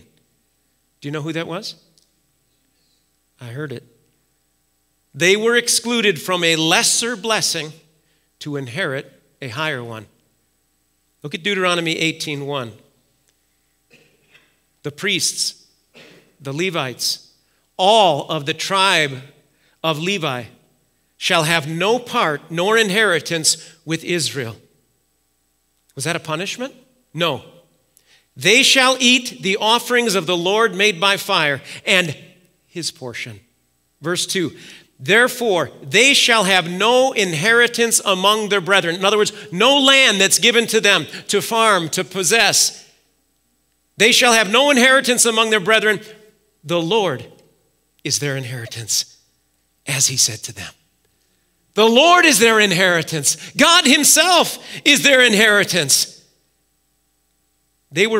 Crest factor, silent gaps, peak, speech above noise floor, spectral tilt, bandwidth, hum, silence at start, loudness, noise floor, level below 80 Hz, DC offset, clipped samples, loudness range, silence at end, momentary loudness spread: 18 dB; none; 0 dBFS; 49 dB; -2 dB/octave; 16 kHz; none; 1.05 s; -15 LUFS; -66 dBFS; -68 dBFS; under 0.1%; under 0.1%; 12 LU; 0 s; 18 LU